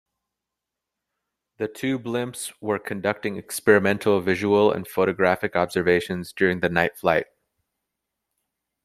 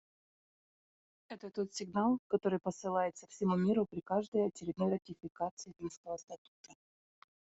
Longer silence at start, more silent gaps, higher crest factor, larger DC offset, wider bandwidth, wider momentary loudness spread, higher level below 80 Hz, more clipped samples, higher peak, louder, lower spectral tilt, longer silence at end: first, 1.6 s vs 1.3 s; second, none vs 2.19-2.30 s, 4.28-4.32 s, 5.51-5.57 s, 5.97-6.04 s, 6.38-6.64 s; about the same, 22 dB vs 18 dB; neither; first, 15.5 kHz vs 8 kHz; about the same, 11 LU vs 13 LU; first, -62 dBFS vs -76 dBFS; neither; first, -2 dBFS vs -18 dBFS; first, -23 LUFS vs -36 LUFS; second, -5 dB/octave vs -6.5 dB/octave; first, 1.6 s vs 0.85 s